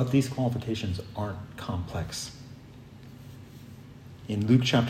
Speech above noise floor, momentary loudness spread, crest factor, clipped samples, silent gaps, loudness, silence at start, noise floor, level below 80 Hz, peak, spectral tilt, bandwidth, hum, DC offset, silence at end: 20 dB; 23 LU; 20 dB; under 0.1%; none; -30 LUFS; 0 s; -47 dBFS; -56 dBFS; -10 dBFS; -6 dB/octave; 14.5 kHz; none; under 0.1%; 0 s